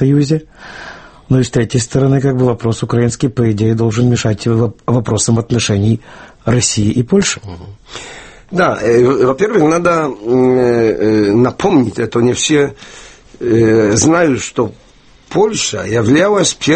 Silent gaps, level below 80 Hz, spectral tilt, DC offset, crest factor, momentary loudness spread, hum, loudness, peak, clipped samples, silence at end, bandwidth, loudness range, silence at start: none; -40 dBFS; -5.5 dB/octave; under 0.1%; 12 dB; 12 LU; none; -13 LUFS; 0 dBFS; under 0.1%; 0 s; 8.8 kHz; 3 LU; 0 s